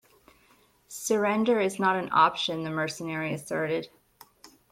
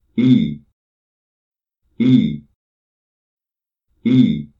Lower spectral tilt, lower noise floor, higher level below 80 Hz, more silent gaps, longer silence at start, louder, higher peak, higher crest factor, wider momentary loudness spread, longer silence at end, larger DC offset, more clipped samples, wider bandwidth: second, -4 dB/octave vs -9 dB/octave; second, -62 dBFS vs -89 dBFS; second, -70 dBFS vs -52 dBFS; second, none vs 0.73-1.52 s, 2.55-3.37 s; first, 0.9 s vs 0.15 s; second, -27 LUFS vs -16 LUFS; second, -8 dBFS vs -2 dBFS; about the same, 20 dB vs 18 dB; about the same, 10 LU vs 12 LU; about the same, 0.25 s vs 0.15 s; neither; neither; first, 16.5 kHz vs 5.4 kHz